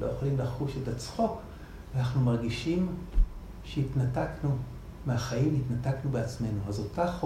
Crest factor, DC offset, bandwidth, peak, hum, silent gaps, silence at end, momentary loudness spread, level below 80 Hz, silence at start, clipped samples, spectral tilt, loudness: 18 dB; under 0.1%; 13 kHz; -12 dBFS; none; none; 0 s; 9 LU; -38 dBFS; 0 s; under 0.1%; -7.5 dB/octave; -31 LUFS